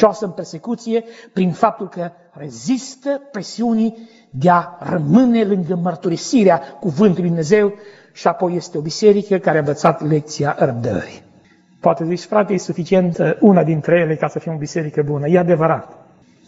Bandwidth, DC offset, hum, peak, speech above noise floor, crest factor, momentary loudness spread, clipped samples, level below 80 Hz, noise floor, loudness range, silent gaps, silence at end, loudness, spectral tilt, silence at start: 8 kHz; under 0.1%; none; 0 dBFS; 34 dB; 16 dB; 12 LU; under 0.1%; -58 dBFS; -51 dBFS; 5 LU; none; 0.55 s; -17 LUFS; -6.5 dB/octave; 0 s